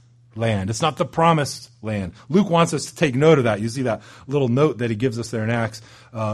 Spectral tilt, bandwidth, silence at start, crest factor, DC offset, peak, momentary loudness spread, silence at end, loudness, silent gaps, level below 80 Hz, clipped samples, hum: -6 dB/octave; 12.5 kHz; 0.35 s; 18 dB; under 0.1%; -2 dBFS; 12 LU; 0 s; -21 LUFS; none; -54 dBFS; under 0.1%; none